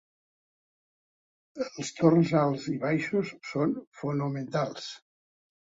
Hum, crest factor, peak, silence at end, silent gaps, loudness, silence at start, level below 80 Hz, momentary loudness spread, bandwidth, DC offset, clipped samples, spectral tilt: none; 22 dB; -8 dBFS; 0.65 s; 3.87-3.92 s; -28 LUFS; 1.55 s; -68 dBFS; 14 LU; 8 kHz; under 0.1%; under 0.1%; -6.5 dB/octave